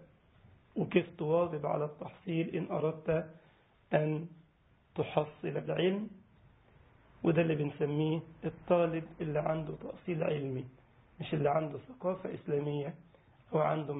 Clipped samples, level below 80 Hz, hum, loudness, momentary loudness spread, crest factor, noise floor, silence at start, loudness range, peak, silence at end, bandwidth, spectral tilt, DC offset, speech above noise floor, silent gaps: under 0.1%; -66 dBFS; none; -34 LUFS; 12 LU; 22 dB; -67 dBFS; 0 s; 3 LU; -12 dBFS; 0 s; 3.9 kHz; -5.5 dB/octave; under 0.1%; 34 dB; none